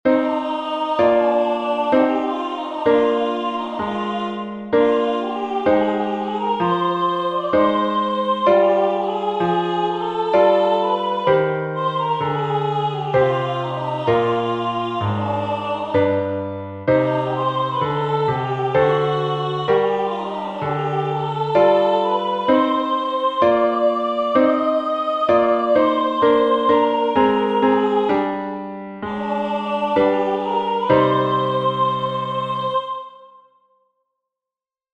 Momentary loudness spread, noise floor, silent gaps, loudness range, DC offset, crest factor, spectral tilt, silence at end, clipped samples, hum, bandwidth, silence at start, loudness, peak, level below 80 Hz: 8 LU; -90 dBFS; none; 4 LU; under 0.1%; 16 dB; -7.5 dB/octave; 1.7 s; under 0.1%; none; 8.4 kHz; 0.05 s; -19 LUFS; -4 dBFS; -56 dBFS